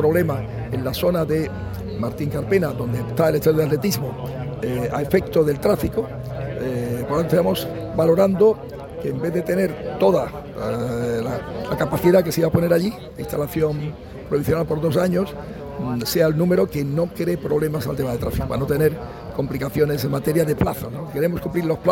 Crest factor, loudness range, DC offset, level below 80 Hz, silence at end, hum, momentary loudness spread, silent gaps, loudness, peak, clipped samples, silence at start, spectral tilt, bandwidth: 18 dB; 2 LU; under 0.1%; -40 dBFS; 0 s; none; 11 LU; none; -21 LUFS; -4 dBFS; under 0.1%; 0 s; -7 dB/octave; 17 kHz